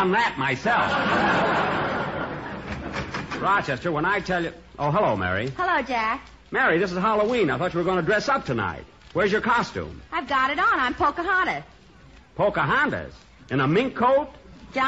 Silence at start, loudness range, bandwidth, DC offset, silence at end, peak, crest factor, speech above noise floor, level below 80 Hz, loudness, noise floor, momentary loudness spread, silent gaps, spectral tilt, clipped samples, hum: 0 s; 2 LU; 8 kHz; under 0.1%; 0 s; -10 dBFS; 14 dB; 27 dB; -48 dBFS; -23 LUFS; -50 dBFS; 11 LU; none; -3.5 dB/octave; under 0.1%; none